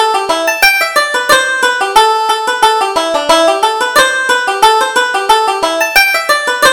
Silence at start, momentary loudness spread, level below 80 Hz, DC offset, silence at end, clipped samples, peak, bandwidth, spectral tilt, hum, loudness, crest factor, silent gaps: 0 s; 4 LU; -44 dBFS; under 0.1%; 0 s; 0.3%; 0 dBFS; over 20 kHz; 0 dB/octave; none; -10 LUFS; 10 dB; none